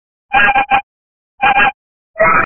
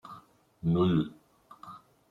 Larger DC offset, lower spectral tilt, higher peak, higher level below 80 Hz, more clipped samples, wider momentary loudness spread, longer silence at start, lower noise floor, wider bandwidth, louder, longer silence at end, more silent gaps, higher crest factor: neither; second, -6 dB/octave vs -9.5 dB/octave; first, 0 dBFS vs -14 dBFS; first, -40 dBFS vs -60 dBFS; neither; second, 5 LU vs 24 LU; first, 0.3 s vs 0.05 s; first, under -90 dBFS vs -56 dBFS; second, 3.3 kHz vs 4.3 kHz; first, -12 LUFS vs -29 LUFS; second, 0 s vs 0.35 s; first, 0.83-1.38 s, 1.74-2.14 s vs none; about the same, 14 dB vs 18 dB